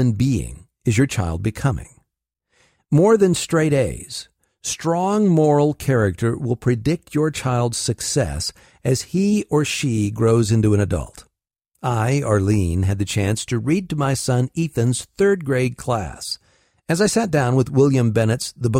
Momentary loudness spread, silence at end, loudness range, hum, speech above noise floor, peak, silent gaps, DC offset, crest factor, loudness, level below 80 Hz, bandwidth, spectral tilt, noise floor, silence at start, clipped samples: 10 LU; 0 s; 2 LU; none; 58 dB; -4 dBFS; none; under 0.1%; 16 dB; -20 LUFS; -42 dBFS; 16 kHz; -6 dB/octave; -77 dBFS; 0 s; under 0.1%